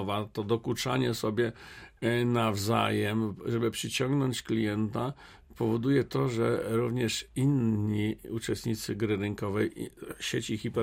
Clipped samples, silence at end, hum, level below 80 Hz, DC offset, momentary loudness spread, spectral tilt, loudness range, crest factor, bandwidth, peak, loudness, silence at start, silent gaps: under 0.1%; 0 s; none; -58 dBFS; under 0.1%; 7 LU; -5.5 dB/octave; 2 LU; 18 dB; 16 kHz; -12 dBFS; -30 LUFS; 0 s; none